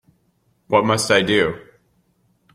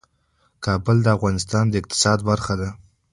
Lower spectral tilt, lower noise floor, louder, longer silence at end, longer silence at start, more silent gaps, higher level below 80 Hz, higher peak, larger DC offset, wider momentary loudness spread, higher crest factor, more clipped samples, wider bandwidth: about the same, -4 dB/octave vs -5 dB/octave; about the same, -64 dBFS vs -65 dBFS; about the same, -18 LUFS vs -20 LUFS; first, 0.95 s vs 0.35 s; about the same, 0.7 s vs 0.6 s; neither; second, -54 dBFS vs -42 dBFS; about the same, -2 dBFS vs -2 dBFS; neither; about the same, 7 LU vs 8 LU; about the same, 18 dB vs 18 dB; neither; first, 16 kHz vs 11.5 kHz